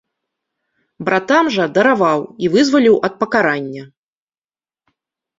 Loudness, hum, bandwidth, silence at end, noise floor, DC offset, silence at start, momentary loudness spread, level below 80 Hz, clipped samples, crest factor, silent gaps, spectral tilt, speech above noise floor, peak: -15 LUFS; none; 7.8 kHz; 1.55 s; under -90 dBFS; under 0.1%; 1 s; 10 LU; -60 dBFS; under 0.1%; 16 dB; none; -5 dB/octave; over 76 dB; -2 dBFS